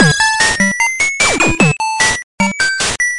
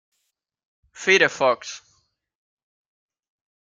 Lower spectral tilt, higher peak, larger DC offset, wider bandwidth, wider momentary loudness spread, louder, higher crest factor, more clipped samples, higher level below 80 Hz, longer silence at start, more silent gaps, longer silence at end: about the same, -2.5 dB/octave vs -2.5 dB/octave; about the same, 0 dBFS vs -2 dBFS; neither; first, 11.5 kHz vs 9 kHz; second, 3 LU vs 20 LU; first, -12 LUFS vs -19 LUFS; second, 14 dB vs 24 dB; neither; first, -36 dBFS vs -74 dBFS; second, 0 s vs 1 s; first, 2.23-2.38 s vs none; second, 0 s vs 1.9 s